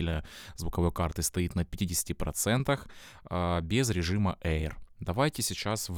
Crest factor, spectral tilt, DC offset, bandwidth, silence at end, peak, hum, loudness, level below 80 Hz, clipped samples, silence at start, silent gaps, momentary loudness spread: 18 dB; -4.5 dB/octave; under 0.1%; 20 kHz; 0 s; -12 dBFS; none; -31 LUFS; -42 dBFS; under 0.1%; 0 s; none; 10 LU